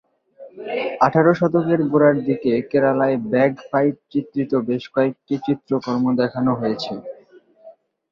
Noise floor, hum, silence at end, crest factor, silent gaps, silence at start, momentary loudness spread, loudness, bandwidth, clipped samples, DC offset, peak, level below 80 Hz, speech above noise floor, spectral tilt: -50 dBFS; none; 0.4 s; 18 dB; none; 0.4 s; 10 LU; -20 LUFS; 7 kHz; under 0.1%; under 0.1%; -2 dBFS; -60 dBFS; 31 dB; -8 dB/octave